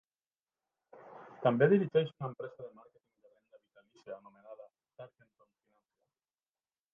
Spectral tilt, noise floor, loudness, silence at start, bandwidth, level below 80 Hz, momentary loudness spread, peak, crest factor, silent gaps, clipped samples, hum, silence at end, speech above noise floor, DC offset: -6.5 dB/octave; under -90 dBFS; -31 LUFS; 1.05 s; 5.6 kHz; -84 dBFS; 27 LU; -14 dBFS; 24 dB; none; under 0.1%; none; 1.85 s; over 58 dB; under 0.1%